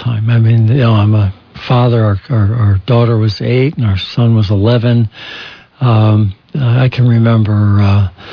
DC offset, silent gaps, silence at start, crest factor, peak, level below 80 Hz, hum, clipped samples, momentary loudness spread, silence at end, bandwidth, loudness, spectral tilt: under 0.1%; none; 0 s; 10 dB; 0 dBFS; -42 dBFS; none; under 0.1%; 7 LU; 0 s; 5.4 kHz; -11 LUFS; -9.5 dB/octave